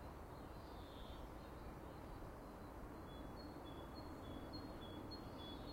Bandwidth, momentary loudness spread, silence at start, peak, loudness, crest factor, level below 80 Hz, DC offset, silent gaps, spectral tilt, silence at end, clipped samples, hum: 16 kHz; 3 LU; 0 s; -40 dBFS; -54 LUFS; 14 dB; -60 dBFS; under 0.1%; none; -6 dB/octave; 0 s; under 0.1%; none